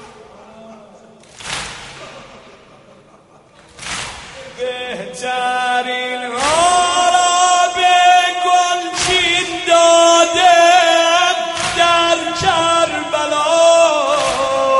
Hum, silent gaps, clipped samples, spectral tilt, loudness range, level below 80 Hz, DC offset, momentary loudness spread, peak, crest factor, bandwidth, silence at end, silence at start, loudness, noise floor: none; none; under 0.1%; -1 dB/octave; 18 LU; -48 dBFS; under 0.1%; 16 LU; 0 dBFS; 14 dB; 11.5 kHz; 0 s; 0 s; -13 LUFS; -46 dBFS